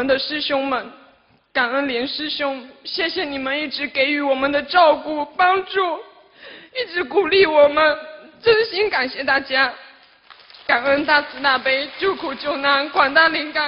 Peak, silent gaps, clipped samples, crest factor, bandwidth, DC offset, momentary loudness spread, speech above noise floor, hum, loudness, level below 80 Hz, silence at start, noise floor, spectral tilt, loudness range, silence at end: 0 dBFS; none; under 0.1%; 20 dB; 5.8 kHz; under 0.1%; 11 LU; 36 dB; none; -18 LUFS; -56 dBFS; 0 s; -55 dBFS; -6 dB/octave; 5 LU; 0 s